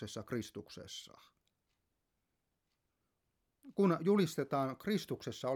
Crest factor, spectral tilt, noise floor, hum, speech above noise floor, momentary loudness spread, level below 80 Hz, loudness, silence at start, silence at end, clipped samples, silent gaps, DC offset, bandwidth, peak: 20 dB; -6 dB/octave; -85 dBFS; none; 49 dB; 16 LU; -76 dBFS; -36 LUFS; 0 s; 0 s; under 0.1%; none; under 0.1%; 18.5 kHz; -20 dBFS